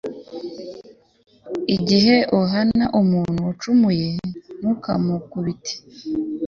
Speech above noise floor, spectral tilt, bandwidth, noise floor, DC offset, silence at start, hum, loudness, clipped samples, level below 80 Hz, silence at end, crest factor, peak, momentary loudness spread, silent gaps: 25 dB; -6.5 dB/octave; 7.2 kHz; -44 dBFS; under 0.1%; 0.05 s; none; -20 LUFS; under 0.1%; -52 dBFS; 0 s; 18 dB; -4 dBFS; 17 LU; none